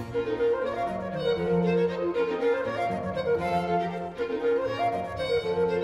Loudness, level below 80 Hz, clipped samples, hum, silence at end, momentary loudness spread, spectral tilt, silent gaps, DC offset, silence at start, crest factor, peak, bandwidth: -27 LUFS; -54 dBFS; under 0.1%; none; 0 s; 5 LU; -7 dB/octave; none; under 0.1%; 0 s; 12 dB; -14 dBFS; 11 kHz